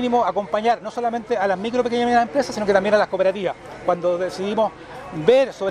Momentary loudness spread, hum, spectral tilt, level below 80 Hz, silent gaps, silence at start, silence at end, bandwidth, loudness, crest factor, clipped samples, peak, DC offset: 8 LU; none; -5 dB/octave; -54 dBFS; none; 0 s; 0 s; 11.5 kHz; -21 LUFS; 18 dB; under 0.1%; -2 dBFS; under 0.1%